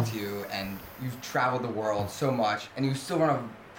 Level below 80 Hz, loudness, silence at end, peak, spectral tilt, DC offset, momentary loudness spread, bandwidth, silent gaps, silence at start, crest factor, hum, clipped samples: -60 dBFS; -30 LUFS; 0 s; -16 dBFS; -5.5 dB/octave; under 0.1%; 10 LU; 17 kHz; none; 0 s; 14 dB; none; under 0.1%